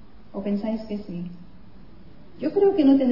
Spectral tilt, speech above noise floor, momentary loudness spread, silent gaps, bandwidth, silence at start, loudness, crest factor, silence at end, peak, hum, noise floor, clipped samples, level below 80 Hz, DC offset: -9.5 dB/octave; 27 dB; 17 LU; none; 5.8 kHz; 0.35 s; -24 LUFS; 16 dB; 0 s; -8 dBFS; none; -48 dBFS; under 0.1%; -52 dBFS; 0.8%